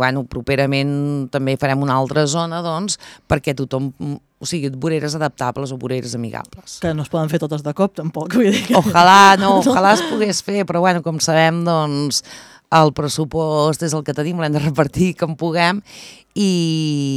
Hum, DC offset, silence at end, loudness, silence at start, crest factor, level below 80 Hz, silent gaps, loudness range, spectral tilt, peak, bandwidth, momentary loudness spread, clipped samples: none; under 0.1%; 0 s; -17 LUFS; 0 s; 16 dB; -48 dBFS; none; 9 LU; -5 dB/octave; 0 dBFS; 16.5 kHz; 12 LU; under 0.1%